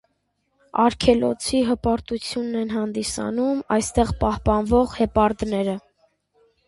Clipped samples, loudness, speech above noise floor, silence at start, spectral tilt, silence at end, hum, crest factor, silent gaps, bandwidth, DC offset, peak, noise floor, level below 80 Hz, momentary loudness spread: under 0.1%; -22 LUFS; 50 dB; 0.75 s; -5.5 dB/octave; 0.9 s; 50 Hz at -55 dBFS; 20 dB; none; 11.5 kHz; under 0.1%; -2 dBFS; -71 dBFS; -38 dBFS; 7 LU